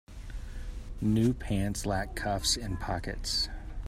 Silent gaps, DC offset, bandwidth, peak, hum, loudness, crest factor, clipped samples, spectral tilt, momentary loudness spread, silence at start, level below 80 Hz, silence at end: none; under 0.1%; 15.5 kHz; -14 dBFS; none; -31 LUFS; 18 dB; under 0.1%; -4.5 dB/octave; 16 LU; 0.1 s; -40 dBFS; 0 s